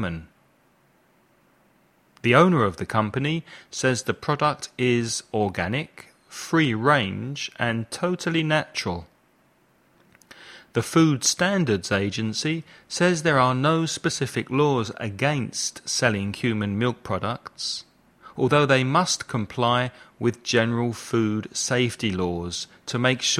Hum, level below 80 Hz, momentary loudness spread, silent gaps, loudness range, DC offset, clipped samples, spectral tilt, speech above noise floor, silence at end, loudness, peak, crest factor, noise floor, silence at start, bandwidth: none; -58 dBFS; 11 LU; none; 3 LU; under 0.1%; under 0.1%; -4.5 dB/octave; 38 dB; 0 s; -24 LUFS; -2 dBFS; 22 dB; -62 dBFS; 0 s; 14.5 kHz